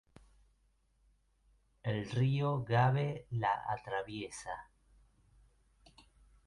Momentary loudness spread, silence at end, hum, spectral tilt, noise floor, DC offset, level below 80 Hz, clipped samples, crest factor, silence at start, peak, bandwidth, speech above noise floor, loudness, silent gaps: 13 LU; 1.85 s; none; -6.5 dB/octave; -73 dBFS; under 0.1%; -64 dBFS; under 0.1%; 18 dB; 1.85 s; -18 dBFS; 11.5 kHz; 39 dB; -35 LUFS; none